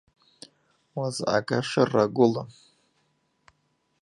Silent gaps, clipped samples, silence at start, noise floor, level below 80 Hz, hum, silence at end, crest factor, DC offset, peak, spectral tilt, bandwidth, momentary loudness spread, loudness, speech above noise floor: none; under 0.1%; 0.95 s; -72 dBFS; -68 dBFS; none; 1.5 s; 22 dB; under 0.1%; -6 dBFS; -5.5 dB/octave; 11.5 kHz; 14 LU; -25 LUFS; 48 dB